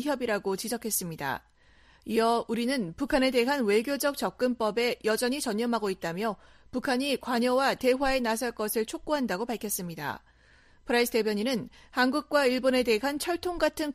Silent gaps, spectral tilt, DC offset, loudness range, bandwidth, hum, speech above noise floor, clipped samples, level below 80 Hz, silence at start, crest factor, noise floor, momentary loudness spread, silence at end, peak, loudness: none; -3.5 dB/octave; under 0.1%; 3 LU; 15.5 kHz; none; 31 dB; under 0.1%; -54 dBFS; 0 s; 18 dB; -59 dBFS; 9 LU; 0 s; -12 dBFS; -28 LUFS